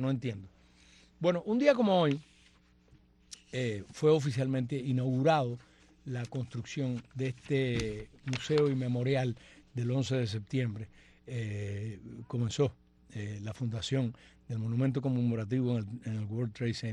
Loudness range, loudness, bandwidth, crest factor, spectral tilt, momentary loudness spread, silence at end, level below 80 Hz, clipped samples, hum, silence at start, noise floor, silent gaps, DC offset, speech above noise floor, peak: 5 LU; -33 LUFS; 10.5 kHz; 20 dB; -7 dB/octave; 14 LU; 0 s; -60 dBFS; under 0.1%; none; 0 s; -63 dBFS; none; under 0.1%; 32 dB; -12 dBFS